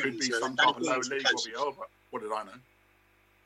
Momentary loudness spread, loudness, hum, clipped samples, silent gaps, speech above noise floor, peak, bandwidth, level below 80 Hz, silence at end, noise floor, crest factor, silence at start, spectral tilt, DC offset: 16 LU; -29 LUFS; 50 Hz at -70 dBFS; under 0.1%; none; 35 dB; -10 dBFS; 15.5 kHz; -74 dBFS; 0.85 s; -65 dBFS; 20 dB; 0 s; -1.5 dB/octave; under 0.1%